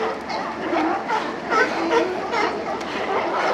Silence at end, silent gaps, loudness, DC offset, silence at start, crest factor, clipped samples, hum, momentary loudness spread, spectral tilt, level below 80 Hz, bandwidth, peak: 0 s; none; -23 LUFS; under 0.1%; 0 s; 18 dB; under 0.1%; none; 7 LU; -4 dB/octave; -56 dBFS; 12.5 kHz; -6 dBFS